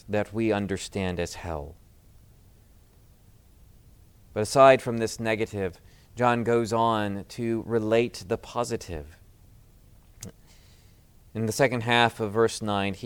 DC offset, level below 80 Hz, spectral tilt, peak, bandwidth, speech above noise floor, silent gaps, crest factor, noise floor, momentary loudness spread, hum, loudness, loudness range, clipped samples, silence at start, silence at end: under 0.1%; -52 dBFS; -5 dB/octave; -4 dBFS; 18.5 kHz; 30 dB; none; 22 dB; -56 dBFS; 16 LU; none; -26 LUFS; 13 LU; under 0.1%; 0.1 s; 0 s